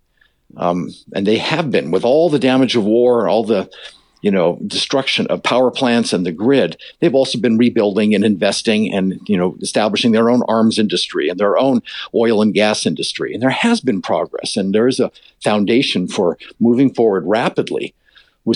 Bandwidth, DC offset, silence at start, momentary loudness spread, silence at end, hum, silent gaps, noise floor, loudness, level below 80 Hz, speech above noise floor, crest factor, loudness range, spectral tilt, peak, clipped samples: 11 kHz; under 0.1%; 0.55 s; 7 LU; 0 s; none; none; -58 dBFS; -16 LUFS; -62 dBFS; 43 dB; 12 dB; 2 LU; -5 dB/octave; -4 dBFS; under 0.1%